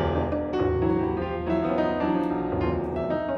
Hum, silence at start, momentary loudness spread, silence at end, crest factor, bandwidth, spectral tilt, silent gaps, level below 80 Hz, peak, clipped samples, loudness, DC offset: none; 0 s; 3 LU; 0 s; 14 dB; 6.2 kHz; -9.5 dB/octave; none; -40 dBFS; -12 dBFS; under 0.1%; -26 LUFS; under 0.1%